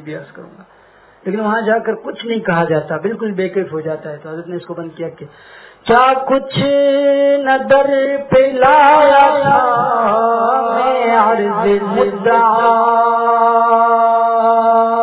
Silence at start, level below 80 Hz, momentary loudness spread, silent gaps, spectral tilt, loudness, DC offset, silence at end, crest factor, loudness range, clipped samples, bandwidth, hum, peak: 0.05 s; -52 dBFS; 16 LU; none; -9.5 dB/octave; -13 LUFS; under 0.1%; 0 s; 14 dB; 9 LU; under 0.1%; 4 kHz; none; 0 dBFS